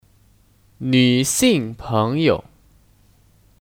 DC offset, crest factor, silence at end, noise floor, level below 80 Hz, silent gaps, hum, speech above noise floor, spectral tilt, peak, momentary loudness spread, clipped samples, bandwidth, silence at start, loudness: under 0.1%; 20 dB; 1.25 s; -55 dBFS; -48 dBFS; none; none; 38 dB; -4.5 dB/octave; -2 dBFS; 8 LU; under 0.1%; 17.5 kHz; 0.8 s; -18 LUFS